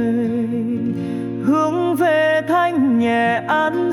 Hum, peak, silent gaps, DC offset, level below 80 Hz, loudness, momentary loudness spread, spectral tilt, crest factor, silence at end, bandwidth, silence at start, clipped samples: none; -6 dBFS; none; under 0.1%; -60 dBFS; -18 LUFS; 6 LU; -6.5 dB/octave; 10 dB; 0 s; 14.5 kHz; 0 s; under 0.1%